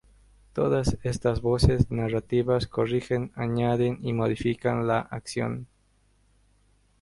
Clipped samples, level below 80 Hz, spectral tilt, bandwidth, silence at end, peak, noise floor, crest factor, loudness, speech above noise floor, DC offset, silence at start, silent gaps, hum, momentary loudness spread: under 0.1%; -40 dBFS; -7 dB/octave; 11.5 kHz; 1.35 s; -6 dBFS; -65 dBFS; 22 dB; -26 LUFS; 39 dB; under 0.1%; 0.55 s; none; 50 Hz at -50 dBFS; 8 LU